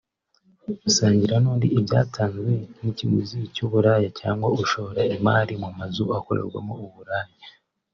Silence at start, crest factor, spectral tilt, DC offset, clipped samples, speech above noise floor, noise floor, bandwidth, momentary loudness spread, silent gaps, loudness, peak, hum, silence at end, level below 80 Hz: 0.7 s; 18 dB; -6 dB/octave; under 0.1%; under 0.1%; 41 dB; -64 dBFS; 7.4 kHz; 12 LU; none; -23 LUFS; -6 dBFS; none; 0.45 s; -58 dBFS